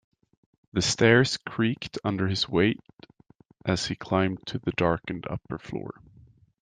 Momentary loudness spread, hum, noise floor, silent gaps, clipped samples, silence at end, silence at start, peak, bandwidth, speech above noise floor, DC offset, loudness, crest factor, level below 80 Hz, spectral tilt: 15 LU; none; -59 dBFS; 2.93-2.97 s; under 0.1%; 0.7 s; 0.75 s; -6 dBFS; 9.8 kHz; 32 dB; under 0.1%; -26 LUFS; 22 dB; -56 dBFS; -5 dB/octave